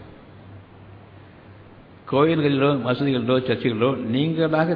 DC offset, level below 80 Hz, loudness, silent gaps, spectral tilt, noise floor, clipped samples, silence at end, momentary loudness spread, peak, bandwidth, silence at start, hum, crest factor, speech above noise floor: under 0.1%; -58 dBFS; -21 LUFS; none; -10 dB/octave; -46 dBFS; under 0.1%; 0 s; 4 LU; -6 dBFS; 5.2 kHz; 0 s; none; 16 dB; 26 dB